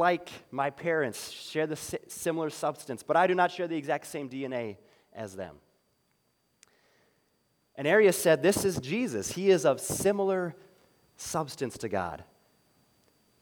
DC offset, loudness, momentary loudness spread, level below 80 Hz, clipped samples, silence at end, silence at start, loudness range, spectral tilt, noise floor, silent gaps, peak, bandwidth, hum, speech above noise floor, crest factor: under 0.1%; -29 LUFS; 16 LU; -66 dBFS; under 0.1%; 1.2 s; 0 s; 13 LU; -4.5 dB/octave; -73 dBFS; none; -12 dBFS; 20 kHz; none; 44 dB; 18 dB